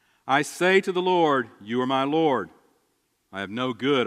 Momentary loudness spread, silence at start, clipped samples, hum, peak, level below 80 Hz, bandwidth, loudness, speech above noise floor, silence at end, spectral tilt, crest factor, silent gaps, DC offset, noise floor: 12 LU; 0.25 s; under 0.1%; none; -6 dBFS; -74 dBFS; 14 kHz; -23 LUFS; 48 dB; 0 s; -5 dB/octave; 18 dB; none; under 0.1%; -71 dBFS